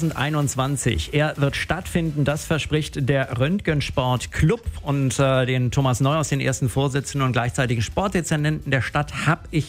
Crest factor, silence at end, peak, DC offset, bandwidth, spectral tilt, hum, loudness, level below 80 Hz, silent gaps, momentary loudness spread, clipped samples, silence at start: 16 dB; 0 s; -6 dBFS; under 0.1%; 16 kHz; -5.5 dB/octave; none; -22 LUFS; -40 dBFS; none; 3 LU; under 0.1%; 0 s